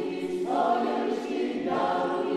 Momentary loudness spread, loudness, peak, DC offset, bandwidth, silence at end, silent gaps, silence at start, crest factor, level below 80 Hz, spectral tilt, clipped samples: 5 LU; -28 LUFS; -14 dBFS; under 0.1%; 12.5 kHz; 0 s; none; 0 s; 14 dB; -72 dBFS; -5.5 dB/octave; under 0.1%